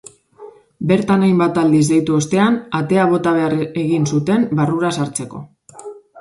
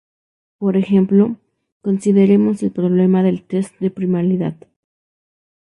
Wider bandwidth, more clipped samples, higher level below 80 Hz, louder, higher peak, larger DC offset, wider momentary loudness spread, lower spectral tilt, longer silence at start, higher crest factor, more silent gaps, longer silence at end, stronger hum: about the same, 11.5 kHz vs 10.5 kHz; neither; about the same, -56 dBFS vs -58 dBFS; about the same, -16 LUFS vs -16 LUFS; about the same, -2 dBFS vs -2 dBFS; neither; first, 16 LU vs 10 LU; second, -6.5 dB/octave vs -9 dB/octave; second, 0.4 s vs 0.6 s; about the same, 16 dB vs 14 dB; second, none vs 1.72-1.80 s; second, 0 s vs 1.1 s; neither